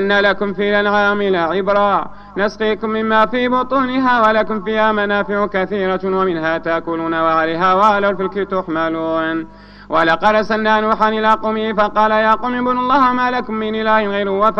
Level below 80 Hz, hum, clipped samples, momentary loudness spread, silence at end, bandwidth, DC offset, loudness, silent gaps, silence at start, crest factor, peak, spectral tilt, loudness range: -44 dBFS; 50 Hz at -40 dBFS; under 0.1%; 7 LU; 0 s; 7.4 kHz; under 0.1%; -16 LUFS; none; 0 s; 16 dB; 0 dBFS; -6.5 dB/octave; 2 LU